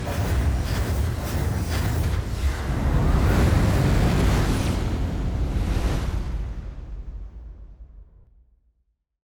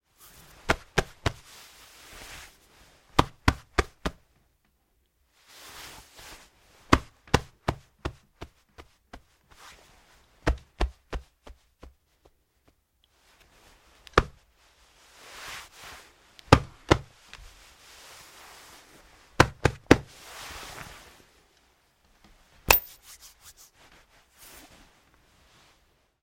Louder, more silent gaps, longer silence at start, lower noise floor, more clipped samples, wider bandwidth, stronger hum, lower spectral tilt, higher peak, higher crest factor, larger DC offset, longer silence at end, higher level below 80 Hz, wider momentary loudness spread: first, -24 LUFS vs -27 LUFS; neither; second, 0 s vs 0.65 s; about the same, -71 dBFS vs -71 dBFS; neither; first, over 20 kHz vs 16.5 kHz; neither; first, -6.5 dB/octave vs -4.5 dB/octave; second, -8 dBFS vs 0 dBFS; second, 14 dB vs 32 dB; neither; second, 1.25 s vs 3.4 s; first, -26 dBFS vs -42 dBFS; second, 18 LU vs 28 LU